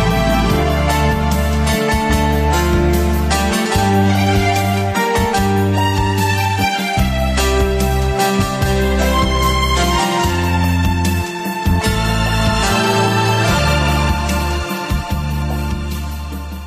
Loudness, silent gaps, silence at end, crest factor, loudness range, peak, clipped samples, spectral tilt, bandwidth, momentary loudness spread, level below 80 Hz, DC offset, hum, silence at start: -16 LUFS; none; 0 s; 12 dB; 1 LU; -4 dBFS; under 0.1%; -5 dB/octave; 15 kHz; 6 LU; -22 dBFS; under 0.1%; none; 0 s